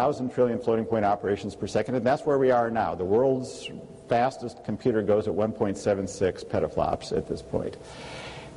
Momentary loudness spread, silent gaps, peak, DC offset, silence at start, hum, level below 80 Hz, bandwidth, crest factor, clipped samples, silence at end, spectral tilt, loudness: 13 LU; none; -10 dBFS; under 0.1%; 0 s; none; -52 dBFS; 11.5 kHz; 16 dB; under 0.1%; 0 s; -6.5 dB/octave; -26 LUFS